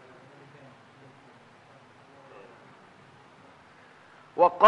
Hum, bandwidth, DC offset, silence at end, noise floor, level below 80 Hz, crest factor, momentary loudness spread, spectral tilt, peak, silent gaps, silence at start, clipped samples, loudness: none; 8 kHz; under 0.1%; 0 s; -55 dBFS; -80 dBFS; 24 dB; 13 LU; -5.5 dB/octave; -6 dBFS; none; 4.35 s; under 0.1%; -26 LUFS